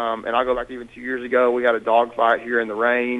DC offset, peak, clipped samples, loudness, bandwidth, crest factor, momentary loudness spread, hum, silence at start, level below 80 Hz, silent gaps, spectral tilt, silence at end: under 0.1%; -4 dBFS; under 0.1%; -20 LUFS; 9.2 kHz; 16 dB; 10 LU; none; 0 s; -54 dBFS; none; -5.5 dB/octave; 0 s